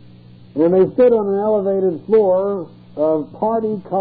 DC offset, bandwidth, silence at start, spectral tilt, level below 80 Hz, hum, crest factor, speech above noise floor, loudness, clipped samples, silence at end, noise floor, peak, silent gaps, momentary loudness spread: 0.1%; 4.7 kHz; 0.55 s; -12.5 dB/octave; -56 dBFS; 60 Hz at -45 dBFS; 12 dB; 26 dB; -17 LUFS; under 0.1%; 0 s; -42 dBFS; -4 dBFS; none; 9 LU